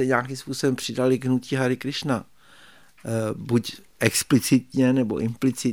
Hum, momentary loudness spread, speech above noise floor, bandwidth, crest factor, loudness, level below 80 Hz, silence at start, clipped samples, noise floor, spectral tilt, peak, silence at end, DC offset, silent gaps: none; 8 LU; 29 dB; 18.5 kHz; 22 dB; -24 LUFS; -60 dBFS; 0 s; under 0.1%; -53 dBFS; -5 dB/octave; -2 dBFS; 0 s; 0.2%; none